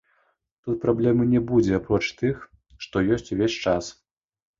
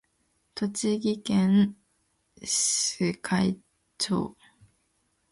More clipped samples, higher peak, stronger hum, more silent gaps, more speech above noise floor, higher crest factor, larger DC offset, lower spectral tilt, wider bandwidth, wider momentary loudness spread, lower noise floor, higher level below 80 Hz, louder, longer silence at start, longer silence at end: neither; first, -6 dBFS vs -12 dBFS; neither; neither; about the same, 46 dB vs 47 dB; about the same, 18 dB vs 16 dB; neither; first, -6.5 dB/octave vs -4 dB/octave; second, 7.6 kHz vs 11.5 kHz; about the same, 13 LU vs 13 LU; about the same, -69 dBFS vs -72 dBFS; first, -48 dBFS vs -62 dBFS; first, -23 LUFS vs -26 LUFS; about the same, 0.65 s vs 0.55 s; second, 0.7 s vs 1 s